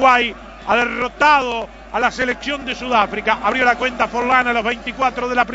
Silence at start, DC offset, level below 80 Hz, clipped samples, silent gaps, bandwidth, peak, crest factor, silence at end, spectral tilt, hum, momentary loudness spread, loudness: 0 s; under 0.1%; -42 dBFS; under 0.1%; none; 8 kHz; 0 dBFS; 18 dB; 0 s; -3.5 dB/octave; none; 9 LU; -17 LUFS